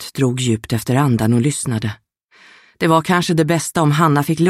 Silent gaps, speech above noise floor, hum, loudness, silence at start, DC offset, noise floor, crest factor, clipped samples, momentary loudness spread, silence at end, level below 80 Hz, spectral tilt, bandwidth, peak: 2.24-2.28 s; 34 dB; none; -17 LUFS; 0 s; under 0.1%; -50 dBFS; 16 dB; under 0.1%; 6 LU; 0 s; -50 dBFS; -5.5 dB/octave; 16 kHz; -2 dBFS